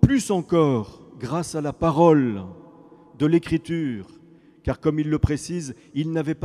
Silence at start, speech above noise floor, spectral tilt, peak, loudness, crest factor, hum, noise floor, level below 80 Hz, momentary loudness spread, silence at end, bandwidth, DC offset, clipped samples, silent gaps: 0 s; 29 dB; -7 dB/octave; 0 dBFS; -23 LUFS; 22 dB; none; -51 dBFS; -40 dBFS; 15 LU; 0 s; 13 kHz; under 0.1%; under 0.1%; none